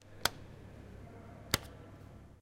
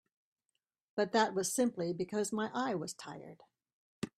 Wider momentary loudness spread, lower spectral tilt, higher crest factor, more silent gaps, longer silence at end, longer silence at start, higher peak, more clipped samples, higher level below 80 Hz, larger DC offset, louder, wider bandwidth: about the same, 17 LU vs 16 LU; second, -2.5 dB/octave vs -4 dB/octave; first, 34 dB vs 22 dB; second, none vs 3.73-4.02 s; about the same, 0 s vs 0.1 s; second, 0 s vs 0.95 s; first, -10 dBFS vs -16 dBFS; neither; first, -56 dBFS vs -78 dBFS; neither; about the same, -36 LUFS vs -35 LUFS; about the same, 16 kHz vs 15.5 kHz